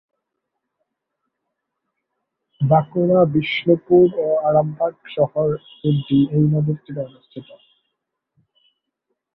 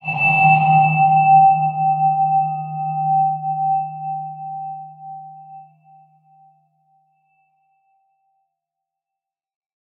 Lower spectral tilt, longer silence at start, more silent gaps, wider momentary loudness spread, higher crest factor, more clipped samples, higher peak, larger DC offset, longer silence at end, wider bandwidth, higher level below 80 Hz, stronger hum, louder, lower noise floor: first, -11 dB/octave vs -9.5 dB/octave; first, 2.6 s vs 0.05 s; neither; second, 15 LU vs 22 LU; about the same, 18 dB vs 16 dB; neither; about the same, -2 dBFS vs -2 dBFS; neither; second, 1.95 s vs 4.35 s; first, 5.2 kHz vs 3.6 kHz; first, -56 dBFS vs -72 dBFS; neither; about the same, -18 LUFS vs -16 LUFS; second, -78 dBFS vs -86 dBFS